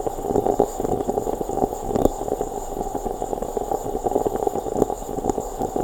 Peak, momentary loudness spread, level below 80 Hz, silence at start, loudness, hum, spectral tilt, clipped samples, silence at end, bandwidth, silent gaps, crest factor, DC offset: 0 dBFS; 6 LU; -36 dBFS; 0 s; -25 LUFS; none; -6.5 dB/octave; under 0.1%; 0 s; over 20 kHz; none; 24 dB; under 0.1%